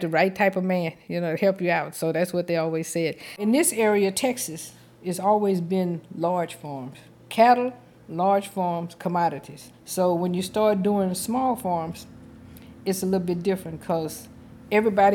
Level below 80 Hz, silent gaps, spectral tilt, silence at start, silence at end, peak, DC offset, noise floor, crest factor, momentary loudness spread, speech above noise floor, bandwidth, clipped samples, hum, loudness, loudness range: -62 dBFS; none; -5 dB/octave; 0 s; 0 s; -6 dBFS; under 0.1%; -45 dBFS; 18 dB; 14 LU; 21 dB; 19 kHz; under 0.1%; none; -24 LUFS; 3 LU